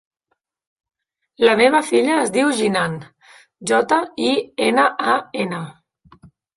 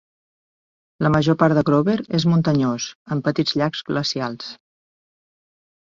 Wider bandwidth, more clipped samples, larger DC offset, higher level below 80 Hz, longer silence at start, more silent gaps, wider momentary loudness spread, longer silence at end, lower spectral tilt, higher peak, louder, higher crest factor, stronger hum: first, 11.5 kHz vs 7.6 kHz; neither; neither; second, -62 dBFS vs -54 dBFS; first, 1.4 s vs 1 s; second, none vs 2.95-3.06 s; about the same, 11 LU vs 10 LU; second, 0.85 s vs 1.3 s; second, -4 dB/octave vs -6 dB/octave; about the same, -2 dBFS vs -2 dBFS; about the same, -18 LUFS vs -20 LUFS; about the same, 18 dB vs 18 dB; neither